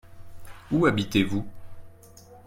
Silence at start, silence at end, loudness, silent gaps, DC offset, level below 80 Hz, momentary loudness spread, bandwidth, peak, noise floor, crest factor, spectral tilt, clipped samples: 0.05 s; 0.05 s; -25 LUFS; none; under 0.1%; -50 dBFS; 11 LU; 16.5 kHz; -8 dBFS; -50 dBFS; 20 dB; -6 dB/octave; under 0.1%